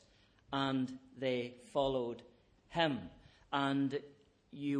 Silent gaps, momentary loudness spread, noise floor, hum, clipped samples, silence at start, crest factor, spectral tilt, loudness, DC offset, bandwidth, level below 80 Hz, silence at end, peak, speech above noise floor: none; 9 LU; -67 dBFS; none; under 0.1%; 0.5 s; 20 dB; -6.5 dB/octave; -37 LUFS; under 0.1%; 10 kHz; -68 dBFS; 0 s; -18 dBFS; 31 dB